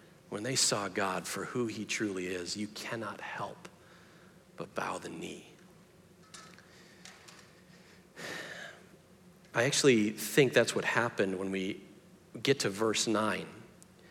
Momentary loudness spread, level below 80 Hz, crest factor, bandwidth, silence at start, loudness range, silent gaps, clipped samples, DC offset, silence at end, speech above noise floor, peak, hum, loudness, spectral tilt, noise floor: 25 LU; -76 dBFS; 22 dB; 17 kHz; 0.3 s; 18 LU; none; under 0.1%; under 0.1%; 0.05 s; 27 dB; -12 dBFS; none; -32 LUFS; -3.5 dB/octave; -59 dBFS